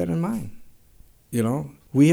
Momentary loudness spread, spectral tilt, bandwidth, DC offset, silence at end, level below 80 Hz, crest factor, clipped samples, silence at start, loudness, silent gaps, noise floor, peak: 9 LU; -7.5 dB/octave; 17 kHz; under 0.1%; 0 s; -52 dBFS; 18 dB; under 0.1%; 0 s; -26 LUFS; none; -52 dBFS; -6 dBFS